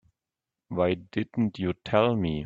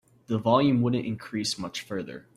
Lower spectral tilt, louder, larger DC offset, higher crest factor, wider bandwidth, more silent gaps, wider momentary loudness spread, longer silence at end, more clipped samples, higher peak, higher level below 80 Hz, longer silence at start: first, -8.5 dB/octave vs -5.5 dB/octave; about the same, -27 LUFS vs -27 LUFS; neither; about the same, 22 dB vs 20 dB; second, 7.4 kHz vs 15 kHz; neither; second, 8 LU vs 12 LU; second, 0 s vs 0.15 s; neither; about the same, -6 dBFS vs -8 dBFS; first, -54 dBFS vs -62 dBFS; first, 0.7 s vs 0.3 s